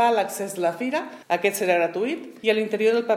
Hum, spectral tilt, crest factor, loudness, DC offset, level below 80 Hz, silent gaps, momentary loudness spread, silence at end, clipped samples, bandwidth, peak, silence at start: none; -3.5 dB/octave; 16 dB; -24 LUFS; under 0.1%; -82 dBFS; none; 6 LU; 0 s; under 0.1%; 16 kHz; -6 dBFS; 0 s